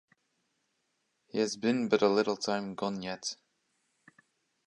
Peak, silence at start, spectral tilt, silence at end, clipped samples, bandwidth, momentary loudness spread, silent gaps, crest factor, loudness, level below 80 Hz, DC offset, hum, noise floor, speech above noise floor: -12 dBFS; 1.35 s; -4.5 dB/octave; 1.35 s; under 0.1%; 11 kHz; 12 LU; none; 22 dB; -31 LUFS; -76 dBFS; under 0.1%; none; -79 dBFS; 48 dB